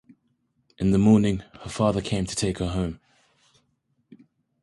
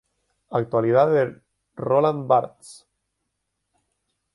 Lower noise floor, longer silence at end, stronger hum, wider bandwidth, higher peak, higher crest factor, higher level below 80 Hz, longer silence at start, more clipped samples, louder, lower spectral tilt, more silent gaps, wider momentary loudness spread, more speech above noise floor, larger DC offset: second, -71 dBFS vs -78 dBFS; second, 0.45 s vs 1.6 s; neither; about the same, 11.5 kHz vs 11.5 kHz; about the same, -6 dBFS vs -4 dBFS; about the same, 20 dB vs 20 dB; first, -44 dBFS vs -66 dBFS; first, 0.8 s vs 0.5 s; neither; second, -24 LUFS vs -21 LUFS; about the same, -6.5 dB/octave vs -7.5 dB/octave; neither; first, 14 LU vs 10 LU; second, 49 dB vs 57 dB; neither